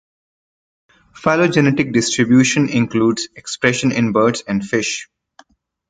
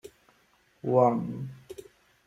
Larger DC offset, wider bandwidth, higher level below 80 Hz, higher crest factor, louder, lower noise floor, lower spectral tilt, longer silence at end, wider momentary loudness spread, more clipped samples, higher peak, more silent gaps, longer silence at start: neither; second, 9.4 kHz vs 14.5 kHz; first, -52 dBFS vs -68 dBFS; second, 16 dB vs 22 dB; first, -16 LUFS vs -27 LUFS; second, -51 dBFS vs -66 dBFS; second, -4.5 dB/octave vs -9 dB/octave; first, 0.85 s vs 0.45 s; second, 9 LU vs 23 LU; neither; first, -2 dBFS vs -8 dBFS; neither; first, 1.15 s vs 0.05 s